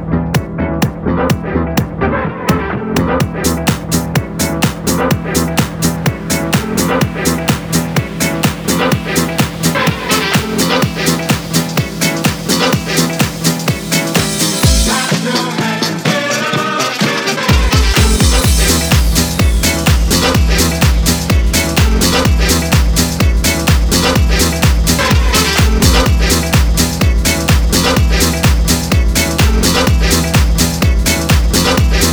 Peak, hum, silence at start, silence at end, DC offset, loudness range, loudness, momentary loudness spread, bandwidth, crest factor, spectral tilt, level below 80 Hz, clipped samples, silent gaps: 0 dBFS; none; 0 s; 0 s; under 0.1%; 4 LU; -12 LUFS; 5 LU; over 20 kHz; 12 dB; -4 dB/octave; -18 dBFS; under 0.1%; none